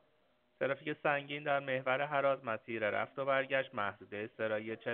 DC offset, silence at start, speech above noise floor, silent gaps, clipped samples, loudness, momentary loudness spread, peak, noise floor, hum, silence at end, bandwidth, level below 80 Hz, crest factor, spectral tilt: under 0.1%; 0.6 s; 38 dB; none; under 0.1%; -36 LUFS; 7 LU; -16 dBFS; -74 dBFS; none; 0 s; 4.3 kHz; -82 dBFS; 20 dB; -3 dB/octave